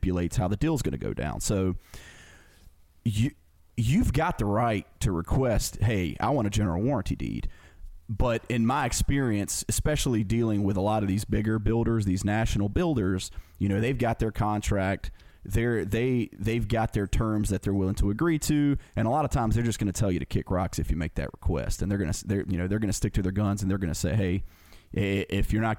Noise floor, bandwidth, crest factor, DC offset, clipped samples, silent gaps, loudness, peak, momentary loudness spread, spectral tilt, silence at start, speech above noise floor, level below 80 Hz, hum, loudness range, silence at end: -55 dBFS; 17 kHz; 12 dB; under 0.1%; under 0.1%; none; -28 LUFS; -14 dBFS; 6 LU; -6 dB/octave; 0 s; 28 dB; -36 dBFS; none; 3 LU; 0 s